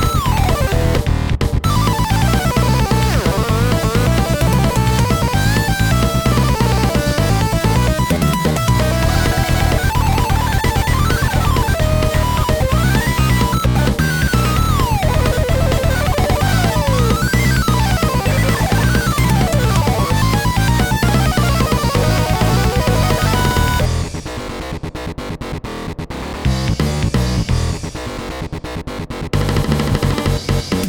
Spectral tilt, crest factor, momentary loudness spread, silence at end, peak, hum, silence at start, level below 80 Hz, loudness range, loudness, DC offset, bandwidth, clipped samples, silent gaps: -5.5 dB/octave; 14 dB; 11 LU; 0 s; 0 dBFS; none; 0 s; -22 dBFS; 5 LU; -16 LUFS; 0.2%; over 20 kHz; under 0.1%; none